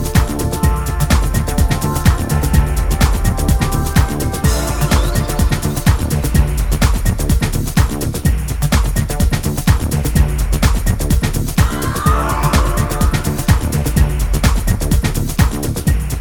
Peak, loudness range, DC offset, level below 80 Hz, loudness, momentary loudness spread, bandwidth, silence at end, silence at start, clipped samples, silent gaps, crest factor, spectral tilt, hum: 0 dBFS; 1 LU; 0.7%; -18 dBFS; -16 LUFS; 3 LU; over 20 kHz; 0 s; 0 s; under 0.1%; none; 14 dB; -5.5 dB/octave; none